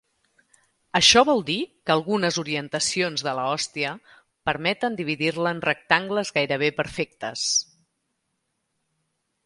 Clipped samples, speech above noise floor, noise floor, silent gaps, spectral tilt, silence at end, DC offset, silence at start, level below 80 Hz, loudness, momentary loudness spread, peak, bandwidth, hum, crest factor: under 0.1%; 53 dB; -76 dBFS; none; -2.5 dB/octave; 1.85 s; under 0.1%; 0.95 s; -58 dBFS; -23 LUFS; 11 LU; 0 dBFS; 11.5 kHz; none; 24 dB